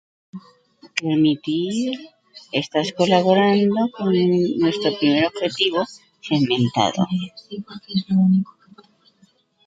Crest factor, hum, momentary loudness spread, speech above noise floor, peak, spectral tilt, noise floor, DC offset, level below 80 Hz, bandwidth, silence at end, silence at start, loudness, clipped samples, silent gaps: 18 dB; none; 16 LU; 39 dB; -2 dBFS; -6 dB/octave; -59 dBFS; under 0.1%; -64 dBFS; 9 kHz; 1.25 s; 0.35 s; -20 LUFS; under 0.1%; none